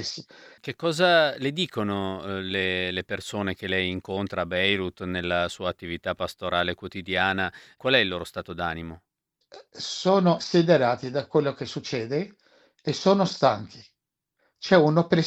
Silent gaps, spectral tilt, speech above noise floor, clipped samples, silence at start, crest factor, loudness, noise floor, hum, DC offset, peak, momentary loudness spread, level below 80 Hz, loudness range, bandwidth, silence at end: none; -5.5 dB/octave; 54 dB; under 0.1%; 0 s; 20 dB; -25 LUFS; -79 dBFS; none; under 0.1%; -6 dBFS; 13 LU; -58 dBFS; 3 LU; 14.5 kHz; 0 s